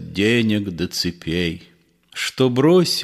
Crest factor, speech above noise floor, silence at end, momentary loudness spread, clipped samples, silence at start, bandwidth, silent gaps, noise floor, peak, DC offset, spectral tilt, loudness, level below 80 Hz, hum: 16 dB; 20 dB; 0 s; 11 LU; under 0.1%; 0 s; 15 kHz; none; -38 dBFS; -4 dBFS; under 0.1%; -5 dB/octave; -19 LUFS; -48 dBFS; none